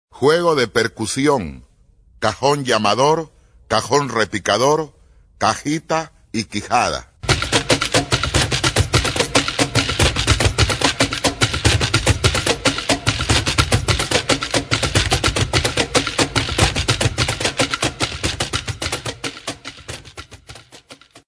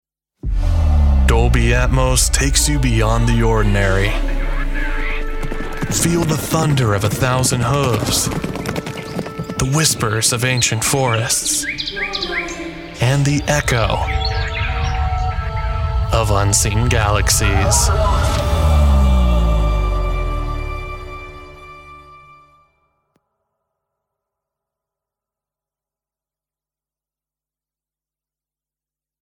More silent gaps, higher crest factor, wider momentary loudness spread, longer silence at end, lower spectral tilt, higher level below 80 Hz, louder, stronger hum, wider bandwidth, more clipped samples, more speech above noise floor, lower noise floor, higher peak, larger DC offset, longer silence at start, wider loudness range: neither; about the same, 18 dB vs 16 dB; second, 9 LU vs 12 LU; second, 0.1 s vs 7.05 s; about the same, -3.5 dB/octave vs -4 dB/octave; second, -32 dBFS vs -22 dBFS; about the same, -18 LUFS vs -17 LUFS; neither; second, 11 kHz vs 17 kHz; neither; second, 34 dB vs over 75 dB; second, -52 dBFS vs under -90 dBFS; about the same, 0 dBFS vs -2 dBFS; neither; second, 0.15 s vs 0.45 s; about the same, 4 LU vs 4 LU